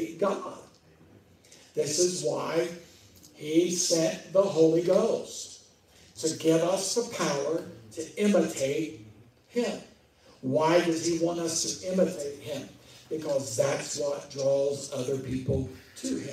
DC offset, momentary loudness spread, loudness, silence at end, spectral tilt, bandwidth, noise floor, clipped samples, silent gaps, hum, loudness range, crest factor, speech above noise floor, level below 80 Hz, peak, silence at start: under 0.1%; 14 LU; -28 LUFS; 0 s; -4 dB/octave; 16 kHz; -58 dBFS; under 0.1%; none; none; 4 LU; 20 dB; 30 dB; -60 dBFS; -10 dBFS; 0 s